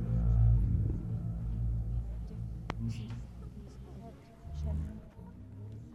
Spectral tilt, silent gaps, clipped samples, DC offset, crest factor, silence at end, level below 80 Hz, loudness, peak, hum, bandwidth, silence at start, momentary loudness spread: -9 dB/octave; none; under 0.1%; under 0.1%; 20 dB; 0 s; -38 dBFS; -35 LUFS; -14 dBFS; none; 6.4 kHz; 0 s; 21 LU